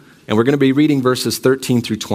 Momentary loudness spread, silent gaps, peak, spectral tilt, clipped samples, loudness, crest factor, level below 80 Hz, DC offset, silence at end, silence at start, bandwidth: 5 LU; none; 0 dBFS; -5.5 dB/octave; under 0.1%; -15 LUFS; 16 dB; -58 dBFS; under 0.1%; 0 s; 0.3 s; 16 kHz